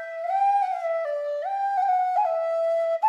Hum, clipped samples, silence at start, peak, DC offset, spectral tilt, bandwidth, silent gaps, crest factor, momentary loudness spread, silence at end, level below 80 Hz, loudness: none; under 0.1%; 0 s; -14 dBFS; under 0.1%; 1 dB/octave; 9.4 kHz; none; 12 dB; 6 LU; 0 s; under -90 dBFS; -25 LUFS